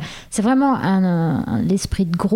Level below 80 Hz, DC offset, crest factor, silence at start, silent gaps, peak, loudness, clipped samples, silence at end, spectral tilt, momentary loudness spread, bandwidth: -38 dBFS; under 0.1%; 12 dB; 0 s; none; -6 dBFS; -19 LUFS; under 0.1%; 0 s; -6.5 dB/octave; 5 LU; 14 kHz